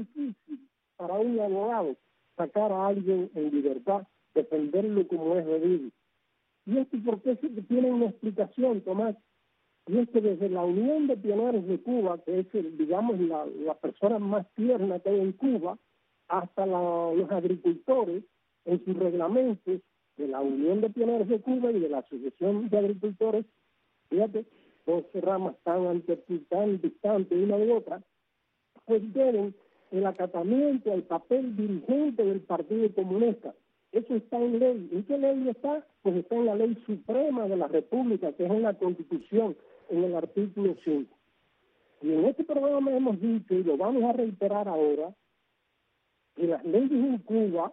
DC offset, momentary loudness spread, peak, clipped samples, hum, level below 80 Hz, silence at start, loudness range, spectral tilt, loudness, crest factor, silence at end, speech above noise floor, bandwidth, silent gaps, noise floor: under 0.1%; 7 LU; -12 dBFS; under 0.1%; none; -78 dBFS; 0 s; 2 LU; -8 dB/octave; -28 LUFS; 16 dB; 0 s; 50 dB; 4 kHz; none; -77 dBFS